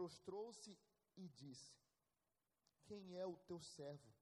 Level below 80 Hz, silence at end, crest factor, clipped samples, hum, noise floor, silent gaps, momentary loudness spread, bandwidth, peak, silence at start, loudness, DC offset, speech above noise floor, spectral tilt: under -90 dBFS; 0.05 s; 18 dB; under 0.1%; none; under -90 dBFS; none; 10 LU; 11.5 kHz; -40 dBFS; 0 s; -56 LUFS; under 0.1%; over 34 dB; -5 dB/octave